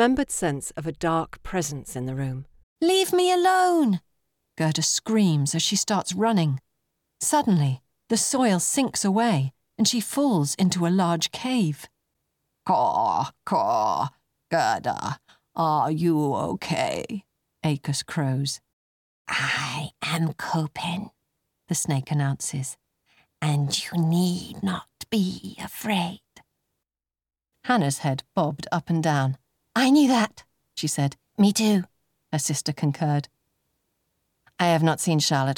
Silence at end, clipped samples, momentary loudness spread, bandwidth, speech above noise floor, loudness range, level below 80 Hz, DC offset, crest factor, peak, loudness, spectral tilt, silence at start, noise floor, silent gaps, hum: 0 s; under 0.1%; 11 LU; 18.5 kHz; over 67 dB; 5 LU; -58 dBFS; under 0.1%; 18 dB; -8 dBFS; -24 LUFS; -4.5 dB/octave; 0 s; under -90 dBFS; 2.63-2.76 s, 18.73-19.25 s; none